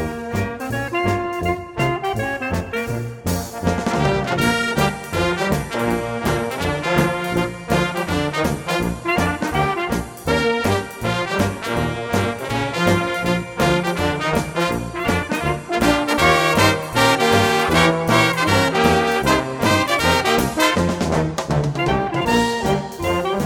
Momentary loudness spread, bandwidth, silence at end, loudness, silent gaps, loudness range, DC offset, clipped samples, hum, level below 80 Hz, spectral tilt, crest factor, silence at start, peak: 8 LU; 19 kHz; 0 s; -19 LUFS; none; 5 LU; under 0.1%; under 0.1%; none; -38 dBFS; -5 dB/octave; 18 dB; 0 s; 0 dBFS